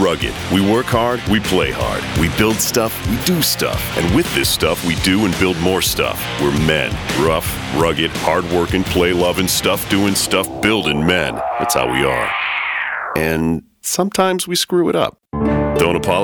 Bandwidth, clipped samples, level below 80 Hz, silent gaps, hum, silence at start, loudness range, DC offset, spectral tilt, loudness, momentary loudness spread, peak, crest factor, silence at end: over 20 kHz; under 0.1%; -34 dBFS; none; none; 0 s; 2 LU; under 0.1%; -4 dB/octave; -16 LUFS; 4 LU; -2 dBFS; 14 dB; 0 s